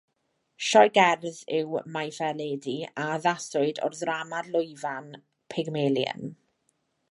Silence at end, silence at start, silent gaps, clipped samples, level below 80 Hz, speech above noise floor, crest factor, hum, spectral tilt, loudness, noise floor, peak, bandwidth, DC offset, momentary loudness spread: 0.75 s; 0.6 s; none; under 0.1%; -80 dBFS; 49 dB; 22 dB; none; -4 dB/octave; -27 LUFS; -76 dBFS; -4 dBFS; 11.5 kHz; under 0.1%; 14 LU